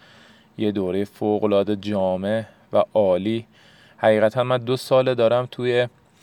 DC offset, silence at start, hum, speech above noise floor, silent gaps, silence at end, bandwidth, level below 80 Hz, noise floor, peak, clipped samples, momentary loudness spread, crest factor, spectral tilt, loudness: under 0.1%; 0.6 s; none; 30 dB; none; 0.35 s; 17.5 kHz; -68 dBFS; -51 dBFS; -4 dBFS; under 0.1%; 7 LU; 18 dB; -7 dB/octave; -21 LUFS